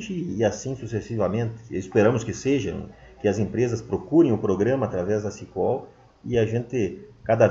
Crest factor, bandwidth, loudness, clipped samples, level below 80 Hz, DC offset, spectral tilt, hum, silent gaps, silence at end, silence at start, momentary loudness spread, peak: 20 dB; 7.8 kHz; -25 LUFS; under 0.1%; -52 dBFS; under 0.1%; -7 dB/octave; none; none; 0 s; 0 s; 11 LU; -4 dBFS